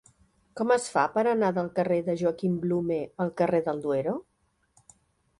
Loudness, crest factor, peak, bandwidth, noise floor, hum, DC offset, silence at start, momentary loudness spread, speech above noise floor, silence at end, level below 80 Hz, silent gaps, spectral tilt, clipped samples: -27 LUFS; 18 dB; -10 dBFS; 11.5 kHz; -67 dBFS; none; under 0.1%; 0.55 s; 7 LU; 41 dB; 1.2 s; -66 dBFS; none; -6.5 dB/octave; under 0.1%